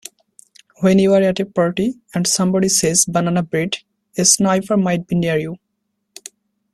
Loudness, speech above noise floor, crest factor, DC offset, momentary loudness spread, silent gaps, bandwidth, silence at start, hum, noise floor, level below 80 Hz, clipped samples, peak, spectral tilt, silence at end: -16 LUFS; 56 dB; 18 dB; under 0.1%; 16 LU; none; 13.5 kHz; 0.8 s; none; -73 dBFS; -54 dBFS; under 0.1%; 0 dBFS; -4 dB/octave; 1.2 s